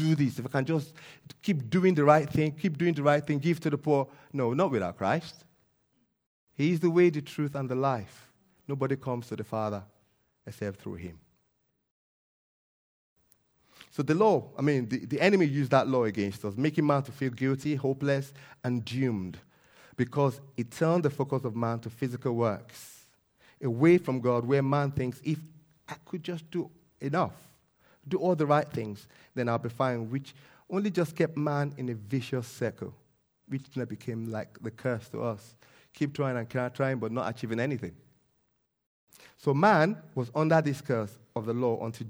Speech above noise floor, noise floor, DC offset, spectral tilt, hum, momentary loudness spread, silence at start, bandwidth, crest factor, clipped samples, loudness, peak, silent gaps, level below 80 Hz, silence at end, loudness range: 47 dB; -76 dBFS; under 0.1%; -7.5 dB/octave; none; 15 LU; 0 s; over 20 kHz; 24 dB; under 0.1%; -29 LUFS; -6 dBFS; 6.26-6.47 s, 11.91-13.16 s, 38.86-39.07 s; -68 dBFS; 0 s; 9 LU